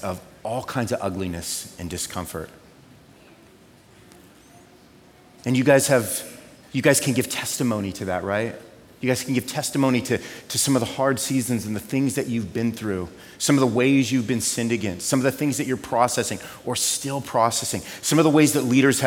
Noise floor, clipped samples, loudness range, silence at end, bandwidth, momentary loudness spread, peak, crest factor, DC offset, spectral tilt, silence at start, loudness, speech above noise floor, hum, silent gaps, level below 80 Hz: -51 dBFS; under 0.1%; 10 LU; 0 s; 17.5 kHz; 12 LU; -4 dBFS; 20 dB; under 0.1%; -4.5 dB/octave; 0 s; -23 LUFS; 29 dB; none; none; -56 dBFS